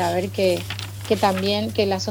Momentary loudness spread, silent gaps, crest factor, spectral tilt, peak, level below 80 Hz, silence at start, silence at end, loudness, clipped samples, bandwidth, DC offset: 7 LU; none; 16 dB; -5 dB/octave; -6 dBFS; -52 dBFS; 0 s; 0 s; -22 LUFS; under 0.1%; over 20 kHz; under 0.1%